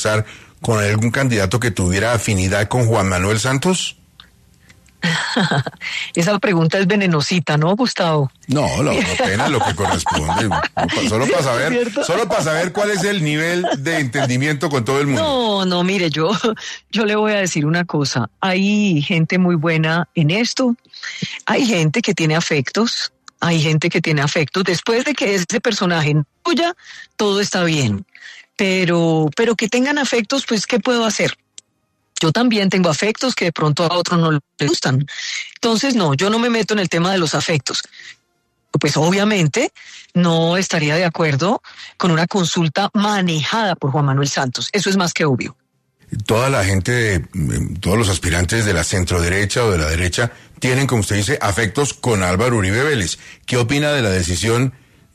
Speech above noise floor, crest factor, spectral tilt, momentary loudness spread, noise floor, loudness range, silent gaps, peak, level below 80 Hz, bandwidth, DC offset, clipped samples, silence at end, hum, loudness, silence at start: 50 dB; 14 dB; -4.5 dB/octave; 5 LU; -67 dBFS; 2 LU; none; -2 dBFS; -40 dBFS; 13.5 kHz; under 0.1%; under 0.1%; 0.45 s; none; -17 LUFS; 0 s